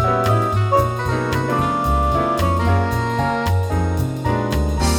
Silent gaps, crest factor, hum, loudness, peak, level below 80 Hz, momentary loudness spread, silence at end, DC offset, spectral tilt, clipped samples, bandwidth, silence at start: none; 14 dB; none; -19 LUFS; -4 dBFS; -28 dBFS; 4 LU; 0 s; under 0.1%; -6.5 dB/octave; under 0.1%; 18 kHz; 0 s